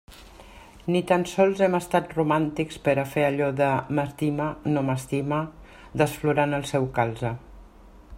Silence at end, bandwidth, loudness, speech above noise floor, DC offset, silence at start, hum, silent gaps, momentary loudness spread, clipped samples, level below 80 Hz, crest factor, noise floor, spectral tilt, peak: 0 s; 16 kHz; -25 LUFS; 25 dB; under 0.1%; 0.1 s; none; none; 6 LU; under 0.1%; -52 dBFS; 20 dB; -49 dBFS; -6.5 dB/octave; -4 dBFS